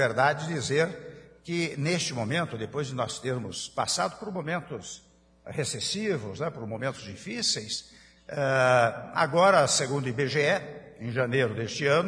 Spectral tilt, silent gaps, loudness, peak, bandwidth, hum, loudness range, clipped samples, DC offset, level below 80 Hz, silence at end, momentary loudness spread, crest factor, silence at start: -4 dB/octave; none; -27 LUFS; -8 dBFS; 10.5 kHz; none; 7 LU; under 0.1%; under 0.1%; -64 dBFS; 0 s; 16 LU; 20 dB; 0 s